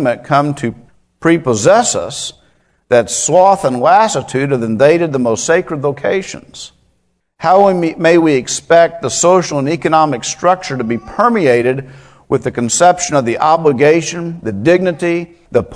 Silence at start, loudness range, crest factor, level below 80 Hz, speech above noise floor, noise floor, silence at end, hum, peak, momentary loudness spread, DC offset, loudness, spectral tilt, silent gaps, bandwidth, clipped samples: 0 s; 3 LU; 12 dB; -50 dBFS; 50 dB; -62 dBFS; 0 s; none; 0 dBFS; 10 LU; under 0.1%; -13 LUFS; -4.5 dB/octave; none; 11 kHz; 0.3%